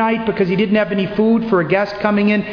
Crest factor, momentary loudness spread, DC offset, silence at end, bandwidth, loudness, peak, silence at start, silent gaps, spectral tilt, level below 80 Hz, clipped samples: 12 dB; 3 LU; under 0.1%; 0 s; 5.4 kHz; -16 LUFS; -2 dBFS; 0 s; none; -8.5 dB/octave; -48 dBFS; under 0.1%